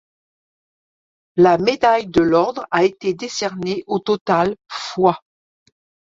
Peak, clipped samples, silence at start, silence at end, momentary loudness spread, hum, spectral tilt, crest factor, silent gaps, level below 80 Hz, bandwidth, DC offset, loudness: -2 dBFS; under 0.1%; 1.35 s; 0.85 s; 10 LU; none; -5.5 dB/octave; 18 dB; 4.21-4.26 s; -54 dBFS; 7.8 kHz; under 0.1%; -18 LUFS